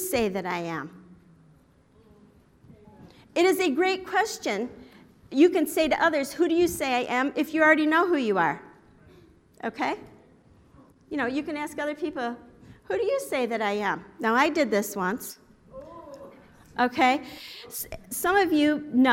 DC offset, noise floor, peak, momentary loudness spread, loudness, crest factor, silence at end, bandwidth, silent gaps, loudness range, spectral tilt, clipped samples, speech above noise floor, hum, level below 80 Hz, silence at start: under 0.1%; -59 dBFS; -6 dBFS; 16 LU; -25 LUFS; 20 dB; 0 s; 16.5 kHz; none; 9 LU; -4 dB/octave; under 0.1%; 34 dB; none; -60 dBFS; 0 s